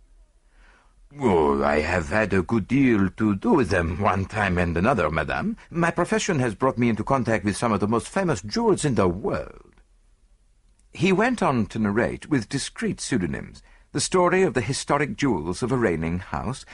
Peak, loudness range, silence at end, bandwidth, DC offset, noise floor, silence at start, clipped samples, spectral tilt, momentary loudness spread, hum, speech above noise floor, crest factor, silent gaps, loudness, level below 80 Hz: -6 dBFS; 4 LU; 0 s; 11.5 kHz; under 0.1%; -59 dBFS; 1.15 s; under 0.1%; -5.5 dB/octave; 8 LU; none; 36 dB; 18 dB; none; -23 LUFS; -44 dBFS